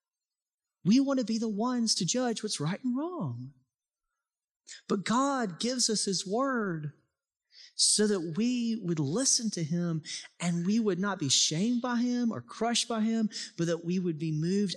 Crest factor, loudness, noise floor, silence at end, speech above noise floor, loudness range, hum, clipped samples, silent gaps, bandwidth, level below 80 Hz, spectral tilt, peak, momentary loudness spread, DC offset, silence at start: 18 dB; -29 LUFS; under -90 dBFS; 0 s; over 61 dB; 4 LU; none; under 0.1%; 4.51-4.60 s; 12.5 kHz; -80 dBFS; -4 dB/octave; -14 dBFS; 9 LU; under 0.1%; 0.85 s